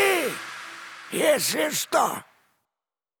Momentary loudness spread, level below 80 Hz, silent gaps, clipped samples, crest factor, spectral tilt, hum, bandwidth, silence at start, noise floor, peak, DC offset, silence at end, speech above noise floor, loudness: 16 LU; -78 dBFS; none; under 0.1%; 18 dB; -2 dB/octave; none; over 20 kHz; 0 s; under -90 dBFS; -10 dBFS; under 0.1%; 1 s; over 67 dB; -24 LUFS